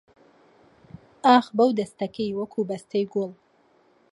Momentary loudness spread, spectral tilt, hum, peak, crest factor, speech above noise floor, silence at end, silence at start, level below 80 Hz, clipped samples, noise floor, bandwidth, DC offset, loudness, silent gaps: 12 LU; -6 dB/octave; none; -4 dBFS; 22 dB; 38 dB; 0.8 s; 1.25 s; -68 dBFS; under 0.1%; -61 dBFS; 11.5 kHz; under 0.1%; -24 LUFS; none